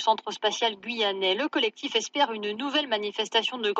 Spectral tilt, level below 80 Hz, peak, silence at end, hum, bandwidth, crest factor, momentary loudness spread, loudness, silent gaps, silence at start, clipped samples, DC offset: -2 dB/octave; -88 dBFS; -10 dBFS; 0 s; none; 8.2 kHz; 18 dB; 3 LU; -26 LUFS; none; 0 s; under 0.1%; under 0.1%